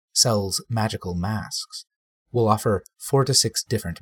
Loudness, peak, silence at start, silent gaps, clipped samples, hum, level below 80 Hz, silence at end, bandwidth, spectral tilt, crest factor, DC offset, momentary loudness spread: -23 LUFS; -4 dBFS; 0.15 s; 1.96-2.26 s; under 0.1%; none; -50 dBFS; 0.05 s; 17.5 kHz; -4 dB/octave; 20 dB; under 0.1%; 11 LU